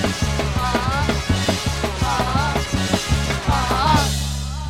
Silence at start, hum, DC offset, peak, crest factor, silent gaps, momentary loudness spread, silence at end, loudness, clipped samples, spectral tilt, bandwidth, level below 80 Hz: 0 s; none; under 0.1%; -2 dBFS; 18 dB; none; 4 LU; 0 s; -20 LUFS; under 0.1%; -4.5 dB/octave; 16.5 kHz; -28 dBFS